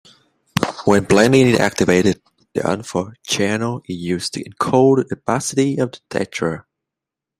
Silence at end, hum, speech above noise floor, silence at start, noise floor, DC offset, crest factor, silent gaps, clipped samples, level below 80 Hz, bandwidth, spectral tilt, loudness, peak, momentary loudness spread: 0.8 s; none; 68 dB; 0.55 s; -85 dBFS; under 0.1%; 18 dB; none; under 0.1%; -50 dBFS; 15.5 kHz; -5 dB/octave; -18 LUFS; 0 dBFS; 12 LU